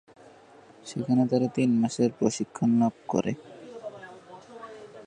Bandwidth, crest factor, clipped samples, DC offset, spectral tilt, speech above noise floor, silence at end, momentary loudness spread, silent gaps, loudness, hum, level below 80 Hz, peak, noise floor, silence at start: 9.8 kHz; 20 dB; under 0.1%; under 0.1%; -6.5 dB/octave; 28 dB; 0 s; 22 LU; none; -26 LUFS; none; -68 dBFS; -8 dBFS; -53 dBFS; 0.85 s